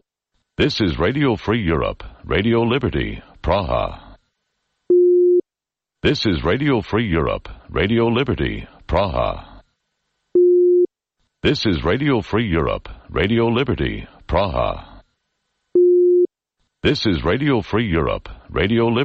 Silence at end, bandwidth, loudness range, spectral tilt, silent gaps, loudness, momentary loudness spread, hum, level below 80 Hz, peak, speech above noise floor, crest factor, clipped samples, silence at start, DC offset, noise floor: 0 s; 6.8 kHz; 3 LU; -7.5 dB/octave; none; -19 LUFS; 11 LU; none; -34 dBFS; -4 dBFS; 68 dB; 14 dB; under 0.1%; 0.6 s; under 0.1%; -87 dBFS